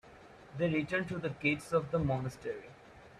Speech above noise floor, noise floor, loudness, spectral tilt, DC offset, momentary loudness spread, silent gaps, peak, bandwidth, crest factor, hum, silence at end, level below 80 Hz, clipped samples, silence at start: 21 dB; -55 dBFS; -34 LUFS; -7 dB/octave; under 0.1%; 13 LU; none; -18 dBFS; 12.5 kHz; 18 dB; none; 0 s; -58 dBFS; under 0.1%; 0.05 s